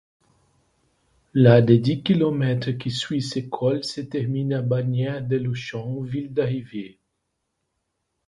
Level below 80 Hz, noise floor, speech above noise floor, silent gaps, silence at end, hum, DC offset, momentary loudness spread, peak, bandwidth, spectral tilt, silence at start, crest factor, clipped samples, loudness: -58 dBFS; -77 dBFS; 55 dB; none; 1.4 s; none; under 0.1%; 14 LU; 0 dBFS; 11 kHz; -7.5 dB/octave; 1.35 s; 22 dB; under 0.1%; -22 LUFS